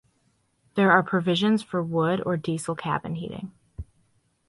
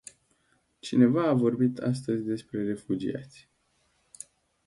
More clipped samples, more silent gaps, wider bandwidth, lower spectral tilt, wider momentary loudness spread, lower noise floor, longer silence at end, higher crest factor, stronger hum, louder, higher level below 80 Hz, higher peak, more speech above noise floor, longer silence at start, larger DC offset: neither; neither; about the same, 11.5 kHz vs 11.5 kHz; about the same, -6 dB/octave vs -7 dB/octave; about the same, 23 LU vs 23 LU; about the same, -68 dBFS vs -71 dBFS; second, 0.65 s vs 1.4 s; about the same, 22 dB vs 20 dB; neither; first, -24 LUFS vs -27 LUFS; first, -52 dBFS vs -66 dBFS; first, -4 dBFS vs -8 dBFS; about the same, 44 dB vs 44 dB; about the same, 0.75 s vs 0.85 s; neither